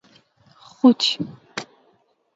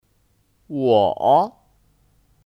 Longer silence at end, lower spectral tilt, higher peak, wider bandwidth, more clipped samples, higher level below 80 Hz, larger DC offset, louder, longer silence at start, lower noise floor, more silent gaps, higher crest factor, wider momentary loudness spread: second, 0.75 s vs 1 s; second, -4 dB/octave vs -8 dB/octave; about the same, -2 dBFS vs -4 dBFS; second, 7.8 kHz vs 12.5 kHz; neither; second, -72 dBFS vs -60 dBFS; neither; about the same, -19 LUFS vs -18 LUFS; first, 0.85 s vs 0.7 s; about the same, -63 dBFS vs -63 dBFS; neither; about the same, 20 dB vs 18 dB; first, 18 LU vs 11 LU